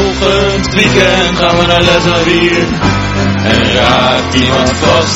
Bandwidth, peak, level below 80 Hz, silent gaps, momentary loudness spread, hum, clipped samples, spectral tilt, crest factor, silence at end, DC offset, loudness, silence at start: 12 kHz; 0 dBFS; -24 dBFS; none; 4 LU; none; 0.4%; -4.5 dB/octave; 10 dB; 0 s; 0.2%; -9 LUFS; 0 s